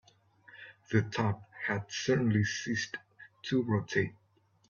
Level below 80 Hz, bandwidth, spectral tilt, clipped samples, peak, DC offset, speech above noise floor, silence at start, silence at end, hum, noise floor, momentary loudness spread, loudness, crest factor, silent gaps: -68 dBFS; 7.4 kHz; -5.5 dB/octave; under 0.1%; -14 dBFS; under 0.1%; 31 dB; 0.55 s; 0.55 s; none; -61 dBFS; 15 LU; -32 LUFS; 18 dB; none